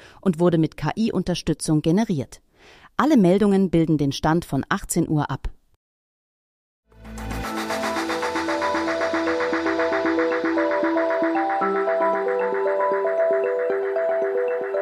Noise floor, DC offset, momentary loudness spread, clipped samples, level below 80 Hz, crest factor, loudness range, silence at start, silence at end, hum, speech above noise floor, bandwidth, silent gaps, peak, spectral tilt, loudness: -51 dBFS; under 0.1%; 7 LU; under 0.1%; -44 dBFS; 18 dB; 7 LU; 0.05 s; 0 s; none; 30 dB; 15.5 kHz; 5.76-6.83 s; -4 dBFS; -6 dB/octave; -22 LUFS